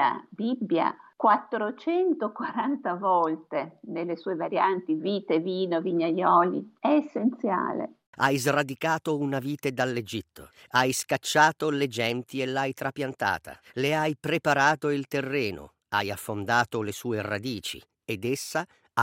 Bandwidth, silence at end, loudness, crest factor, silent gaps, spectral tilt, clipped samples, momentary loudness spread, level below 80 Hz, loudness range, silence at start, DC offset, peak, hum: 16 kHz; 0 s; -27 LUFS; 22 dB; 8.07-8.13 s; -4.5 dB/octave; under 0.1%; 10 LU; -68 dBFS; 3 LU; 0 s; under 0.1%; -6 dBFS; none